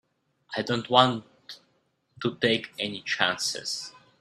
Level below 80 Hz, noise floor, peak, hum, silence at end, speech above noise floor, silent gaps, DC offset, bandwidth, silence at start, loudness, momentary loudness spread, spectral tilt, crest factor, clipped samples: -68 dBFS; -71 dBFS; -2 dBFS; none; 0.3 s; 44 dB; none; under 0.1%; 14 kHz; 0.5 s; -26 LUFS; 23 LU; -3.5 dB/octave; 26 dB; under 0.1%